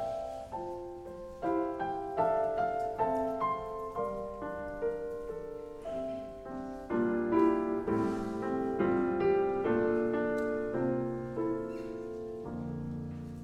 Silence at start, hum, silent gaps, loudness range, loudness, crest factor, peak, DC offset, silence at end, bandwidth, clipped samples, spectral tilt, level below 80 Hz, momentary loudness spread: 0 s; none; none; 6 LU; -34 LUFS; 18 dB; -16 dBFS; under 0.1%; 0 s; 10.5 kHz; under 0.1%; -8 dB/octave; -56 dBFS; 12 LU